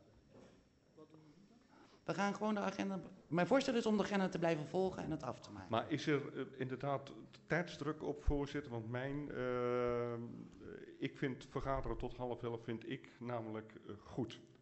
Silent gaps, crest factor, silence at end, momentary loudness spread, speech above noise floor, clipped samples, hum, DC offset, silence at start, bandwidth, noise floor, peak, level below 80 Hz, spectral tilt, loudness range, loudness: none; 20 dB; 0.15 s; 13 LU; 28 dB; under 0.1%; none; under 0.1%; 0.35 s; 8.2 kHz; -68 dBFS; -20 dBFS; -56 dBFS; -6.5 dB/octave; 6 LU; -41 LUFS